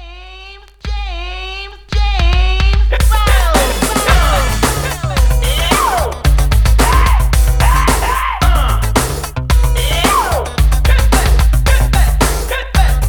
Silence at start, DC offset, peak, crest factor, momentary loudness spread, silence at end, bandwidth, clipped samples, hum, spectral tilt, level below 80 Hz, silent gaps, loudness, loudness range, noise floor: 0 s; under 0.1%; 0 dBFS; 12 dB; 11 LU; 0 s; 19.5 kHz; under 0.1%; none; -4 dB/octave; -12 dBFS; none; -13 LUFS; 2 LU; -35 dBFS